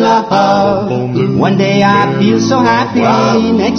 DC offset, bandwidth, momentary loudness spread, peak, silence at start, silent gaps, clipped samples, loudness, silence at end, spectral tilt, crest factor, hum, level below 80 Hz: under 0.1%; 6.6 kHz; 4 LU; 0 dBFS; 0 s; none; under 0.1%; -11 LUFS; 0 s; -6 dB/octave; 10 dB; none; -46 dBFS